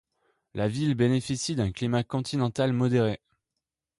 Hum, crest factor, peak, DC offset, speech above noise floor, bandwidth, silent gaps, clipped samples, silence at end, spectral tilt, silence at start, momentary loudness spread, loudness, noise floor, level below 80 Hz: none; 14 dB; -12 dBFS; under 0.1%; 60 dB; 11.5 kHz; none; under 0.1%; 0.85 s; -6 dB/octave; 0.55 s; 6 LU; -27 LUFS; -86 dBFS; -54 dBFS